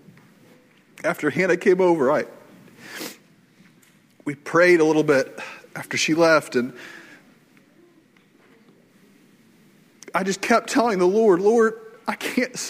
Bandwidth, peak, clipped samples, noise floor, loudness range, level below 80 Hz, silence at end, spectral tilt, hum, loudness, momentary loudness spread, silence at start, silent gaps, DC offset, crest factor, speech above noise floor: 16 kHz; -4 dBFS; under 0.1%; -56 dBFS; 8 LU; -70 dBFS; 0 s; -4.5 dB/octave; none; -20 LUFS; 18 LU; 1.05 s; none; under 0.1%; 18 dB; 37 dB